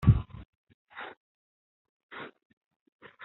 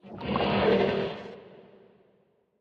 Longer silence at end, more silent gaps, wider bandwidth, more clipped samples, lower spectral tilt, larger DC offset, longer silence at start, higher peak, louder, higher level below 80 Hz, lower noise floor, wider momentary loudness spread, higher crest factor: second, 0 s vs 1 s; first, 0.45-0.64 s, 0.74-0.87 s, 1.17-2.09 s, 2.45-2.86 s, 2.92-2.99 s vs none; second, 4.1 kHz vs 6.8 kHz; neither; about the same, -8 dB/octave vs -8 dB/octave; neither; about the same, 0 s vs 0.05 s; first, -8 dBFS vs -12 dBFS; second, -34 LUFS vs -27 LUFS; first, -44 dBFS vs -54 dBFS; first, under -90 dBFS vs -68 dBFS; first, 25 LU vs 20 LU; first, 26 dB vs 18 dB